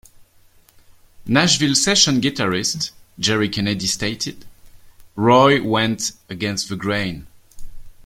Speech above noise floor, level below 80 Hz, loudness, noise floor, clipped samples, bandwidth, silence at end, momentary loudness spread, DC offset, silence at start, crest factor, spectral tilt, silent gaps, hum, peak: 34 dB; -46 dBFS; -18 LUFS; -52 dBFS; under 0.1%; 16.5 kHz; 0.15 s; 14 LU; under 0.1%; 0.2 s; 20 dB; -3.5 dB/octave; none; none; -2 dBFS